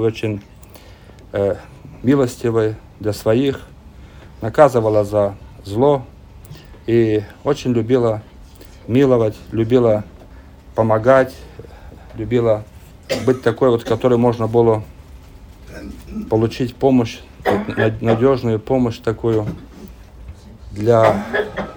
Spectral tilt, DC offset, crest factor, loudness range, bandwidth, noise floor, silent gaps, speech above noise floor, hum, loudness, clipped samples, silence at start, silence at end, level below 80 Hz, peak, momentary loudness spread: -7.5 dB/octave; under 0.1%; 18 dB; 3 LU; over 20 kHz; -41 dBFS; none; 25 dB; none; -17 LUFS; under 0.1%; 0 s; 0 s; -42 dBFS; 0 dBFS; 17 LU